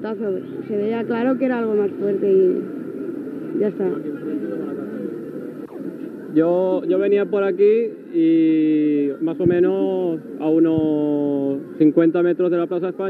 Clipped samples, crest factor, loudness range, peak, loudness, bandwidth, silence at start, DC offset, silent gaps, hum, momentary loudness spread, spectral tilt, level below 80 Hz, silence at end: under 0.1%; 16 dB; 7 LU; -4 dBFS; -20 LUFS; 4.4 kHz; 0 s; under 0.1%; none; none; 13 LU; -9.5 dB/octave; -66 dBFS; 0 s